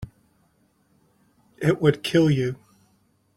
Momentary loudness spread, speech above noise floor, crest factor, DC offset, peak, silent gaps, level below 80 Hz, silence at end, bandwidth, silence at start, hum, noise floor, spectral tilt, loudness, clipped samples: 18 LU; 44 dB; 22 dB; under 0.1%; -4 dBFS; none; -56 dBFS; 0.85 s; 13.5 kHz; 0 s; none; -64 dBFS; -7 dB/octave; -22 LUFS; under 0.1%